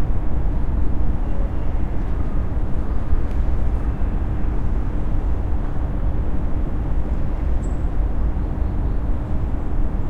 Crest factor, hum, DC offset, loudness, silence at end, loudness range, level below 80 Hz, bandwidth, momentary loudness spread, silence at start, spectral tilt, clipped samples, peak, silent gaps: 12 dB; none; under 0.1%; -25 LUFS; 0 s; 0 LU; -22 dBFS; 3.7 kHz; 2 LU; 0 s; -9.5 dB/octave; under 0.1%; -6 dBFS; none